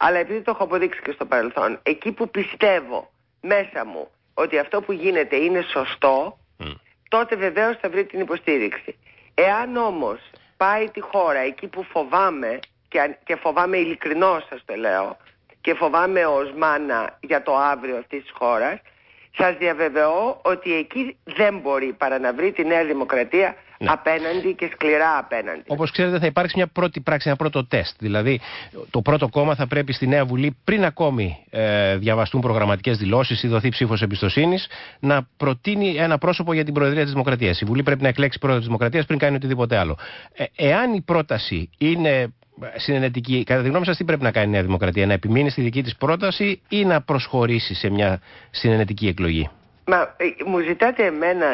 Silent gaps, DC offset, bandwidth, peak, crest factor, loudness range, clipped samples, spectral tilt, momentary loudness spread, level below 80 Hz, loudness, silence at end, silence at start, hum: none; under 0.1%; 5.8 kHz; -6 dBFS; 16 dB; 2 LU; under 0.1%; -11 dB/octave; 8 LU; -44 dBFS; -21 LUFS; 0 s; 0 s; none